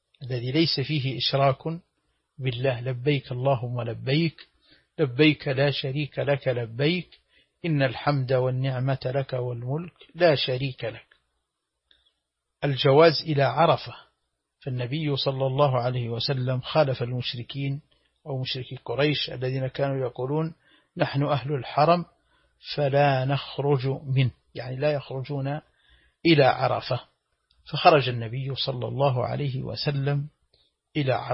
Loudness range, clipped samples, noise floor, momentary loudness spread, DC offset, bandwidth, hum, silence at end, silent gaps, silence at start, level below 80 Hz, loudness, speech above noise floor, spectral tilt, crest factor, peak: 4 LU; under 0.1%; -80 dBFS; 12 LU; under 0.1%; 5.8 kHz; none; 0 s; none; 0.2 s; -60 dBFS; -25 LUFS; 56 dB; -10 dB/octave; 22 dB; -4 dBFS